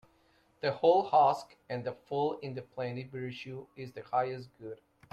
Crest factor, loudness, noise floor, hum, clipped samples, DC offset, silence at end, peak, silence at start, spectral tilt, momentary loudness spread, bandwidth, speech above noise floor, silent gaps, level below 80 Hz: 20 dB; -32 LUFS; -68 dBFS; none; under 0.1%; under 0.1%; 0.4 s; -12 dBFS; 0.65 s; -6.5 dB/octave; 19 LU; 9 kHz; 36 dB; none; -74 dBFS